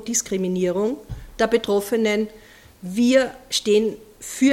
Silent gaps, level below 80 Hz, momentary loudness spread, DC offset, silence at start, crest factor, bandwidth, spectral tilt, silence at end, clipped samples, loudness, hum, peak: none; -48 dBFS; 15 LU; under 0.1%; 0 s; 16 dB; 16.5 kHz; -4 dB/octave; 0 s; under 0.1%; -21 LUFS; none; -4 dBFS